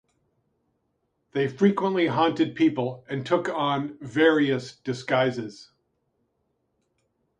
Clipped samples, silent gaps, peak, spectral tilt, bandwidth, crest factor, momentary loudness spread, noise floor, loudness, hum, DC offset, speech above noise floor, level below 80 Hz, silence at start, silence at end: under 0.1%; none; -6 dBFS; -6.5 dB/octave; 9.8 kHz; 20 dB; 12 LU; -75 dBFS; -24 LUFS; none; under 0.1%; 51 dB; -70 dBFS; 1.35 s; 1.75 s